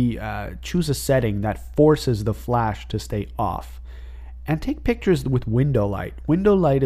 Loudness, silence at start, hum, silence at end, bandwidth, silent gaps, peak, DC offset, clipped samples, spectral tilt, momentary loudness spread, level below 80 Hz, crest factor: -22 LUFS; 0 s; none; 0 s; 15.5 kHz; none; -4 dBFS; under 0.1%; under 0.1%; -7 dB/octave; 15 LU; -36 dBFS; 18 dB